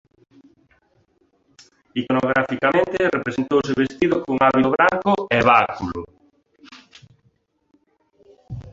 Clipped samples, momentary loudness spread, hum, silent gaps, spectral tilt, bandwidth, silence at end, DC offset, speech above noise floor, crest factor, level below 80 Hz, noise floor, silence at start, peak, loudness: under 0.1%; 14 LU; none; none; -6.5 dB/octave; 7.8 kHz; 0 s; under 0.1%; 45 dB; 20 dB; -52 dBFS; -64 dBFS; 1.95 s; -2 dBFS; -19 LUFS